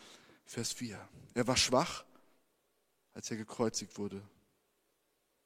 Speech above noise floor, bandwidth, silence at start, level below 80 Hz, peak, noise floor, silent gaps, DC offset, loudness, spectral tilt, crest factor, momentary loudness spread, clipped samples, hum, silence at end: 43 dB; 16 kHz; 0 s; -64 dBFS; -14 dBFS; -79 dBFS; none; under 0.1%; -35 LUFS; -3 dB/octave; 24 dB; 17 LU; under 0.1%; none; 1.2 s